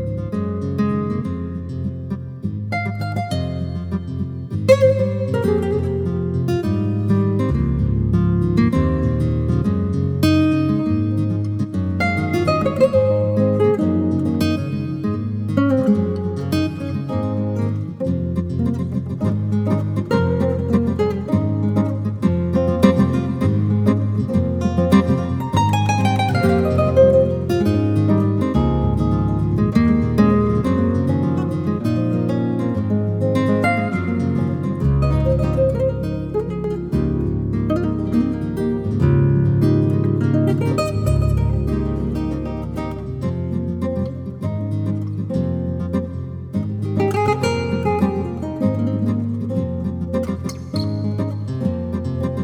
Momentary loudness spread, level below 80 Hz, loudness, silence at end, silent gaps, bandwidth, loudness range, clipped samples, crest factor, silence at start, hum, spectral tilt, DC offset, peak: 8 LU; -34 dBFS; -19 LUFS; 0 s; none; 13.5 kHz; 6 LU; under 0.1%; 18 dB; 0 s; none; -8.5 dB/octave; under 0.1%; 0 dBFS